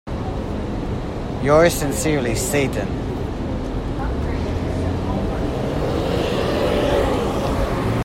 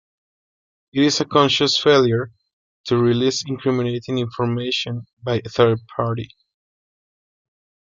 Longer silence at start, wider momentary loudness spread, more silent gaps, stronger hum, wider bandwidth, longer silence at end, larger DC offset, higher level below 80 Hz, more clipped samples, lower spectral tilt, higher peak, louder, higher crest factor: second, 0.05 s vs 0.95 s; second, 9 LU vs 13 LU; second, none vs 2.53-2.84 s, 5.13-5.17 s; neither; first, 16.5 kHz vs 7.6 kHz; second, 0 s vs 1.55 s; neither; first, -30 dBFS vs -58 dBFS; neither; about the same, -5.5 dB/octave vs -5 dB/octave; about the same, -2 dBFS vs -2 dBFS; about the same, -21 LUFS vs -19 LUFS; about the same, 18 dB vs 18 dB